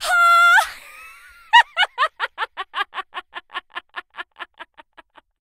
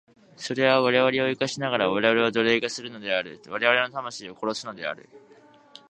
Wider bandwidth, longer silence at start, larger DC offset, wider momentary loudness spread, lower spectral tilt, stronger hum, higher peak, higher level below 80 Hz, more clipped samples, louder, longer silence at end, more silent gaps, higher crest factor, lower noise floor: first, 16 kHz vs 9.4 kHz; second, 0 s vs 0.4 s; neither; first, 24 LU vs 13 LU; second, 2 dB/octave vs -4 dB/octave; neither; first, 0 dBFS vs -4 dBFS; first, -62 dBFS vs -70 dBFS; neither; first, -17 LUFS vs -24 LUFS; about the same, 0.75 s vs 0.7 s; neither; about the same, 20 dB vs 22 dB; about the same, -51 dBFS vs -51 dBFS